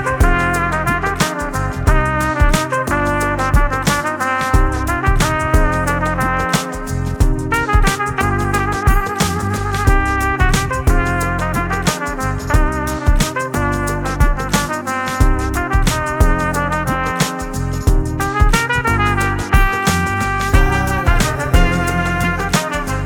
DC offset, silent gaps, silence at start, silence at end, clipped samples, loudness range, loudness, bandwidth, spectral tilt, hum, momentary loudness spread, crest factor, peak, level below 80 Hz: under 0.1%; none; 0 s; 0 s; under 0.1%; 2 LU; -17 LUFS; 18.5 kHz; -5 dB/octave; none; 4 LU; 16 dB; 0 dBFS; -20 dBFS